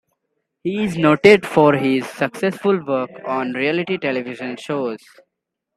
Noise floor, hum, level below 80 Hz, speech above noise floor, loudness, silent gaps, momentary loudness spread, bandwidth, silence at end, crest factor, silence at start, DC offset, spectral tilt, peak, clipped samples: -79 dBFS; none; -60 dBFS; 61 dB; -18 LUFS; none; 14 LU; 13 kHz; 0.8 s; 20 dB; 0.65 s; under 0.1%; -6.5 dB/octave; 0 dBFS; under 0.1%